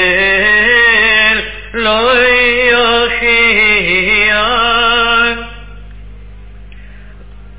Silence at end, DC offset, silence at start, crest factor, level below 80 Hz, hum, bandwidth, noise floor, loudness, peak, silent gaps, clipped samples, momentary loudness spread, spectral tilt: 0 s; 2%; 0 s; 12 dB; -32 dBFS; 50 Hz at -30 dBFS; 4 kHz; -33 dBFS; -8 LUFS; 0 dBFS; none; under 0.1%; 7 LU; -6 dB/octave